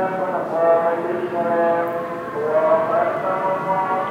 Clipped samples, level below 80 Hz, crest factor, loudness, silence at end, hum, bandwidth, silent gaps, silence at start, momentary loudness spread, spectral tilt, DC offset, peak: under 0.1%; -64 dBFS; 14 dB; -20 LUFS; 0 s; none; 15 kHz; none; 0 s; 6 LU; -7.5 dB/octave; under 0.1%; -6 dBFS